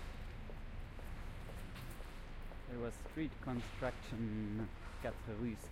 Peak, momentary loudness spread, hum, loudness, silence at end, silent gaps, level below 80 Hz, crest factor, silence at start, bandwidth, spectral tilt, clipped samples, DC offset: -26 dBFS; 10 LU; none; -46 LUFS; 0 s; none; -50 dBFS; 18 dB; 0 s; 16 kHz; -6.5 dB/octave; under 0.1%; under 0.1%